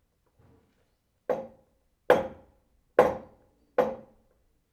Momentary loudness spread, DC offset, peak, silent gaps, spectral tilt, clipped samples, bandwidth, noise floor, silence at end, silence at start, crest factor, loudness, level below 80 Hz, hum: 17 LU; under 0.1%; -4 dBFS; none; -6 dB/octave; under 0.1%; 13 kHz; -72 dBFS; 0.75 s; 1.3 s; 26 dB; -28 LUFS; -62 dBFS; none